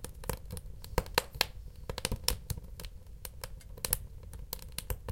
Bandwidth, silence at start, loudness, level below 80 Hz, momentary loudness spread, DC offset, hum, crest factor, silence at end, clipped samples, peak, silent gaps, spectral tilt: 17 kHz; 0 s; -37 LUFS; -44 dBFS; 15 LU; under 0.1%; none; 34 dB; 0 s; under 0.1%; -4 dBFS; none; -2.5 dB/octave